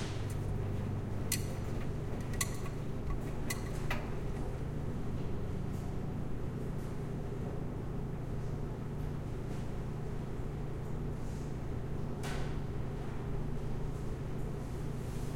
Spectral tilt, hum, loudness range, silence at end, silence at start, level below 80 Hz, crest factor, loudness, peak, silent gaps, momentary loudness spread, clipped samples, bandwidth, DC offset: -6 dB/octave; none; 2 LU; 0 s; 0 s; -44 dBFS; 20 dB; -40 LUFS; -16 dBFS; none; 4 LU; under 0.1%; 16.5 kHz; under 0.1%